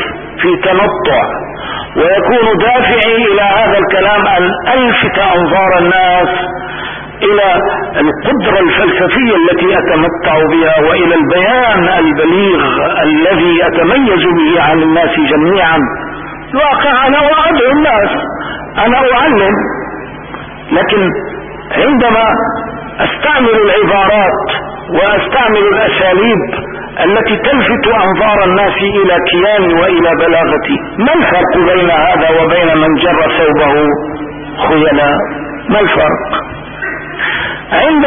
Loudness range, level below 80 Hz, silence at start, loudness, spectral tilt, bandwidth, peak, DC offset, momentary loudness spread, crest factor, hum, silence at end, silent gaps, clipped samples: 3 LU; -34 dBFS; 0 s; -9 LUFS; -9.5 dB/octave; 3.7 kHz; 0 dBFS; under 0.1%; 10 LU; 10 dB; none; 0 s; none; under 0.1%